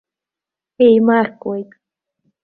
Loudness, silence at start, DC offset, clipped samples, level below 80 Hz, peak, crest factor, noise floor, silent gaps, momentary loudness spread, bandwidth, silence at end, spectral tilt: -14 LUFS; 0.8 s; under 0.1%; under 0.1%; -64 dBFS; -2 dBFS; 16 dB; -87 dBFS; none; 14 LU; 4.4 kHz; 0.8 s; -10 dB/octave